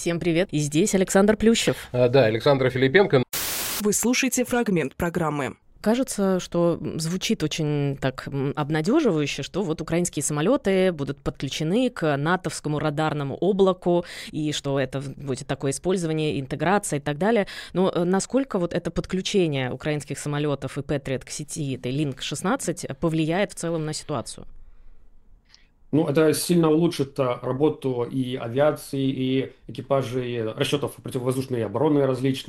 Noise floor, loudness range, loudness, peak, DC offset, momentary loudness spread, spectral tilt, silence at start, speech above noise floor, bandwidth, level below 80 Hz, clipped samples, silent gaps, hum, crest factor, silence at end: -55 dBFS; 6 LU; -24 LUFS; -2 dBFS; under 0.1%; 9 LU; -5 dB/octave; 0 s; 31 dB; 16 kHz; -50 dBFS; under 0.1%; none; none; 22 dB; 0.05 s